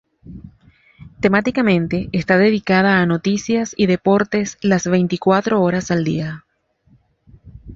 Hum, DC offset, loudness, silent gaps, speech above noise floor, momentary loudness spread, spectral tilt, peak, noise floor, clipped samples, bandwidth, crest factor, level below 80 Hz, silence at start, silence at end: none; under 0.1%; -17 LUFS; none; 41 dB; 6 LU; -6 dB/octave; 0 dBFS; -58 dBFS; under 0.1%; 7.6 kHz; 18 dB; -48 dBFS; 0.25 s; 0 s